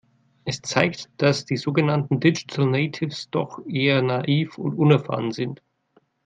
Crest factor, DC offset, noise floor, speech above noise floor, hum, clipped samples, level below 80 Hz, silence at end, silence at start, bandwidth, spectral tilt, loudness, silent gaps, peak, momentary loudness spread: 22 dB; under 0.1%; -63 dBFS; 41 dB; none; under 0.1%; -64 dBFS; 0.7 s; 0.45 s; 8.8 kHz; -6 dB/octave; -23 LUFS; none; 0 dBFS; 10 LU